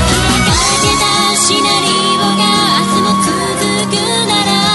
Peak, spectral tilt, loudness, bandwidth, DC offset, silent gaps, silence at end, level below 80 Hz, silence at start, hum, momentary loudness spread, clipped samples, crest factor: 0 dBFS; -3 dB/octave; -10 LUFS; 12 kHz; under 0.1%; none; 0 s; -28 dBFS; 0 s; none; 4 LU; under 0.1%; 12 dB